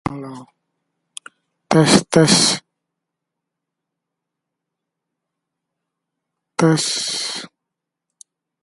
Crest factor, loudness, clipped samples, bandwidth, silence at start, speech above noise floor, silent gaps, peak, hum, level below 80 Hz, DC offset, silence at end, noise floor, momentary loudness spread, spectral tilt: 22 dB; -16 LUFS; under 0.1%; 11.5 kHz; 0.05 s; 66 dB; none; 0 dBFS; none; -56 dBFS; under 0.1%; 1.15 s; -82 dBFS; 24 LU; -4 dB/octave